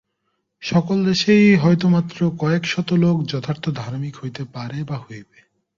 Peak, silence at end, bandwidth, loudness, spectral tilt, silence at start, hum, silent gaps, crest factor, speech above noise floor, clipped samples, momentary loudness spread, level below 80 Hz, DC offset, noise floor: -4 dBFS; 0.55 s; 7.4 kHz; -19 LUFS; -6.5 dB/octave; 0.6 s; none; none; 16 dB; 54 dB; under 0.1%; 17 LU; -56 dBFS; under 0.1%; -73 dBFS